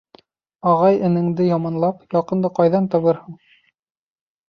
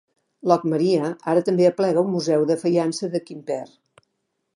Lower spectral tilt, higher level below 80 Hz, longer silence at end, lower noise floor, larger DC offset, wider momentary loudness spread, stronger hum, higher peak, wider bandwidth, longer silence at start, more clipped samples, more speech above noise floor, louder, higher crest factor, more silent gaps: first, -10 dB/octave vs -6.5 dB/octave; first, -64 dBFS vs -74 dBFS; first, 1.15 s vs 0.9 s; first, under -90 dBFS vs -75 dBFS; neither; second, 7 LU vs 11 LU; neither; about the same, -4 dBFS vs -2 dBFS; second, 6.4 kHz vs 11.5 kHz; first, 0.65 s vs 0.45 s; neither; first, over 72 dB vs 55 dB; first, -18 LUFS vs -21 LUFS; about the same, 16 dB vs 20 dB; neither